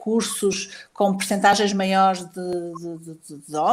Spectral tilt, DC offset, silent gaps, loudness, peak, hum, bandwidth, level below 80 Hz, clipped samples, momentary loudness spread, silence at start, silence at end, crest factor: -4 dB/octave; under 0.1%; none; -21 LUFS; -2 dBFS; none; 16 kHz; -64 dBFS; under 0.1%; 17 LU; 0 s; 0 s; 20 dB